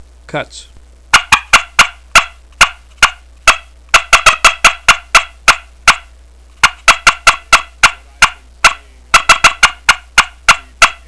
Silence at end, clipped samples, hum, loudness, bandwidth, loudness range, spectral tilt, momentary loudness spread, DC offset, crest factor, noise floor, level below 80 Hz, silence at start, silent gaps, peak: 0.15 s; 2%; none; -9 LUFS; 11 kHz; 2 LU; 0.5 dB/octave; 5 LU; 0.4%; 12 dB; -40 dBFS; -30 dBFS; 0.35 s; none; 0 dBFS